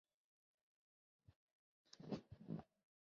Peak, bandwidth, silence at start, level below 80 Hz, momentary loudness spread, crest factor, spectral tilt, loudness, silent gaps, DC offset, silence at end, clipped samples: -34 dBFS; 6.6 kHz; 1.3 s; -80 dBFS; 10 LU; 24 dB; -7 dB/octave; -54 LUFS; 1.36-1.85 s; under 0.1%; 0.45 s; under 0.1%